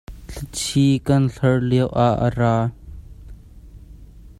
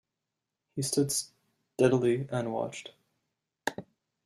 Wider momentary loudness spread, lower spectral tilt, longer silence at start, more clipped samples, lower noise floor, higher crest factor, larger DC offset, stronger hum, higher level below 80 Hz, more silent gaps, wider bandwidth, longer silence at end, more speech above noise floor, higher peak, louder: second, 11 LU vs 20 LU; first, -6.5 dB/octave vs -4.5 dB/octave; second, 0.1 s vs 0.75 s; neither; second, -42 dBFS vs -87 dBFS; about the same, 18 dB vs 22 dB; neither; neither; first, -40 dBFS vs -70 dBFS; neither; about the same, 13 kHz vs 14 kHz; second, 0.1 s vs 0.45 s; second, 24 dB vs 58 dB; first, -4 dBFS vs -10 dBFS; first, -19 LUFS vs -30 LUFS